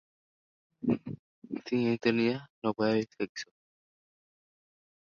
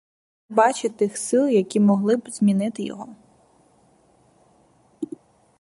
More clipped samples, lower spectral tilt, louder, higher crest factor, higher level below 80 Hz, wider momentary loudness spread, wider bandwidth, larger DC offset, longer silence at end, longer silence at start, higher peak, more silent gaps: neither; about the same, -6.5 dB/octave vs -6 dB/octave; second, -31 LUFS vs -21 LUFS; about the same, 20 dB vs 20 dB; about the same, -70 dBFS vs -70 dBFS; about the same, 15 LU vs 17 LU; second, 7 kHz vs 11.5 kHz; neither; first, 1.7 s vs 0.55 s; first, 0.8 s vs 0.5 s; second, -14 dBFS vs -4 dBFS; first, 1.19-1.42 s, 2.50-2.62 s, 3.29-3.35 s vs none